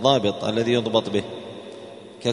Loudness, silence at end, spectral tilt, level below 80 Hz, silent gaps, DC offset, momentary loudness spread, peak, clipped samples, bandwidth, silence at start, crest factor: -23 LUFS; 0 s; -5.5 dB/octave; -60 dBFS; none; under 0.1%; 19 LU; -2 dBFS; under 0.1%; 10.5 kHz; 0 s; 22 dB